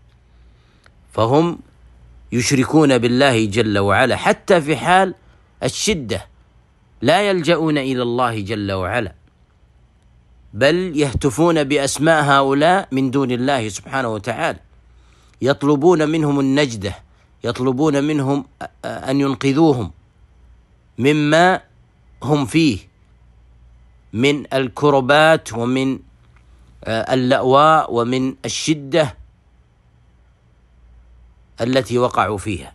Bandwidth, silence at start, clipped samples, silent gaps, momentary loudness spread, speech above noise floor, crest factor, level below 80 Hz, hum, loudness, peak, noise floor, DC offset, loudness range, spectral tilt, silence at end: 12.5 kHz; 1.15 s; under 0.1%; none; 12 LU; 37 dB; 18 dB; -46 dBFS; none; -17 LUFS; 0 dBFS; -53 dBFS; under 0.1%; 5 LU; -5 dB/octave; 0.05 s